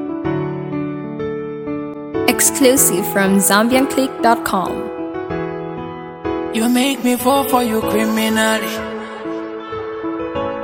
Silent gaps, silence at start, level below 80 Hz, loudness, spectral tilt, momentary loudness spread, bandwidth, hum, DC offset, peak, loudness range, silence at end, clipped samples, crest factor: none; 0 s; -48 dBFS; -17 LUFS; -3.5 dB/octave; 14 LU; 17 kHz; none; under 0.1%; 0 dBFS; 5 LU; 0 s; under 0.1%; 18 dB